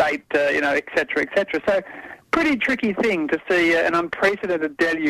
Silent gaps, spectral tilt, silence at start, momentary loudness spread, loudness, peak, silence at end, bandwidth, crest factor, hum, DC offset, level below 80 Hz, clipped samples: none; -4.5 dB/octave; 0 s; 6 LU; -21 LUFS; -10 dBFS; 0 s; 14 kHz; 12 dB; none; under 0.1%; -54 dBFS; under 0.1%